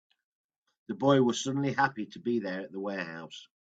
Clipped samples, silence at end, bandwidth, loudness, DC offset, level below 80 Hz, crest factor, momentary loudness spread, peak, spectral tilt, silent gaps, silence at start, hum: under 0.1%; 0.3 s; 8.4 kHz; -30 LUFS; under 0.1%; -74 dBFS; 20 dB; 17 LU; -12 dBFS; -5.5 dB/octave; none; 0.9 s; none